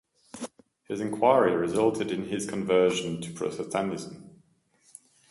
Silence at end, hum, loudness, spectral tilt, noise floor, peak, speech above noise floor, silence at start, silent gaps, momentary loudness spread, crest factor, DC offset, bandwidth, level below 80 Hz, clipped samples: 1 s; none; -27 LUFS; -5 dB/octave; -65 dBFS; -8 dBFS; 39 dB; 0.35 s; none; 18 LU; 20 dB; under 0.1%; 11.5 kHz; -64 dBFS; under 0.1%